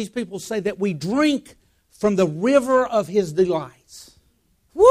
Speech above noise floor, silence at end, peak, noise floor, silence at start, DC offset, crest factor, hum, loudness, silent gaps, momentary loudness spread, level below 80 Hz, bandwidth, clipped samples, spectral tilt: 42 dB; 0 s; -2 dBFS; -63 dBFS; 0 s; under 0.1%; 18 dB; none; -21 LUFS; none; 11 LU; -54 dBFS; 15.5 kHz; under 0.1%; -6 dB/octave